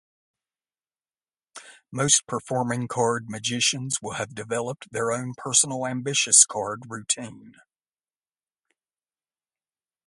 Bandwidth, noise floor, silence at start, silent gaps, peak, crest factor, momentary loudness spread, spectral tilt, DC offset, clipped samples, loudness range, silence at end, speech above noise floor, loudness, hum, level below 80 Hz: 11.5 kHz; under -90 dBFS; 1.55 s; none; 0 dBFS; 26 dB; 15 LU; -2 dB/octave; under 0.1%; under 0.1%; 6 LU; 2.55 s; over 65 dB; -23 LUFS; none; -66 dBFS